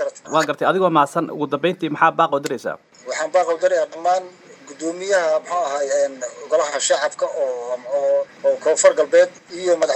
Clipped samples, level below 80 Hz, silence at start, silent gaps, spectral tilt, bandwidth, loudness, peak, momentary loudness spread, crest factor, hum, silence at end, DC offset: under 0.1%; -78 dBFS; 0 s; none; -3.5 dB/octave; 12.5 kHz; -19 LUFS; 0 dBFS; 10 LU; 18 dB; none; 0 s; under 0.1%